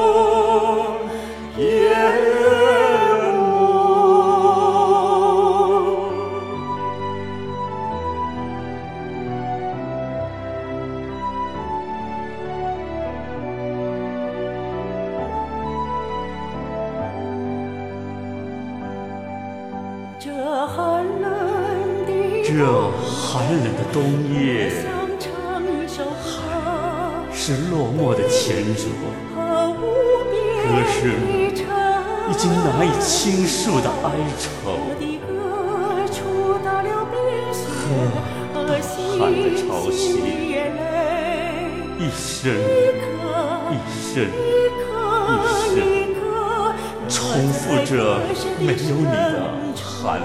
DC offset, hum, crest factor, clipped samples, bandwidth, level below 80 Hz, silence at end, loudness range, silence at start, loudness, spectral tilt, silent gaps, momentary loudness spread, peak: 0.4%; none; 16 dB; under 0.1%; 15 kHz; -44 dBFS; 0 s; 11 LU; 0 s; -21 LUFS; -5 dB/octave; none; 12 LU; -4 dBFS